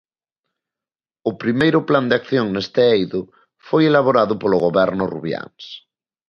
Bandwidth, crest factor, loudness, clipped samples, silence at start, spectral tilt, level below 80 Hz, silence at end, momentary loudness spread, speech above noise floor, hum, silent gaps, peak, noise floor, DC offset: 6.8 kHz; 18 dB; -18 LUFS; under 0.1%; 1.25 s; -7.5 dB/octave; -56 dBFS; 0.5 s; 13 LU; over 73 dB; none; none; -2 dBFS; under -90 dBFS; under 0.1%